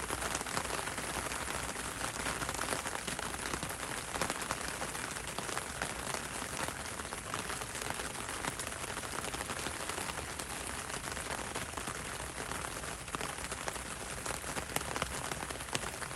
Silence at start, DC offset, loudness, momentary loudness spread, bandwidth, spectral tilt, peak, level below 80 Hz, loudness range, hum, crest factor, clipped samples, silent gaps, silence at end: 0 s; under 0.1%; -38 LUFS; 4 LU; 16 kHz; -2 dB/octave; -12 dBFS; -54 dBFS; 2 LU; none; 28 dB; under 0.1%; none; 0 s